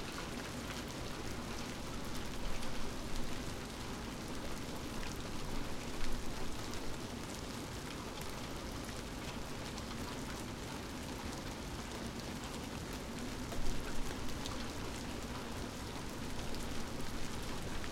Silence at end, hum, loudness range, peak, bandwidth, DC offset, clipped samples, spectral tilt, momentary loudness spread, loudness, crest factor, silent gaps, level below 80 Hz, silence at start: 0 s; none; 1 LU; -22 dBFS; 16.5 kHz; under 0.1%; under 0.1%; -4 dB/octave; 1 LU; -43 LUFS; 18 dB; none; -46 dBFS; 0 s